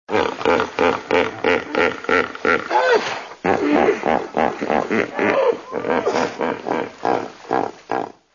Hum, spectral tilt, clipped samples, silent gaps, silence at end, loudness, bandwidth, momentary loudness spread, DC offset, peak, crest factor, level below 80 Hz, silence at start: none; -4.5 dB/octave; under 0.1%; none; 0.25 s; -20 LUFS; 7.4 kHz; 7 LU; under 0.1%; -2 dBFS; 18 dB; -54 dBFS; 0.1 s